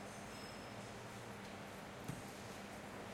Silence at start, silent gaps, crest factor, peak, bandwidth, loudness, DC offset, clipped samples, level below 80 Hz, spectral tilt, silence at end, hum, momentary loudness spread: 0 s; none; 18 dB; -32 dBFS; 16 kHz; -51 LUFS; under 0.1%; under 0.1%; -70 dBFS; -4.5 dB/octave; 0 s; none; 2 LU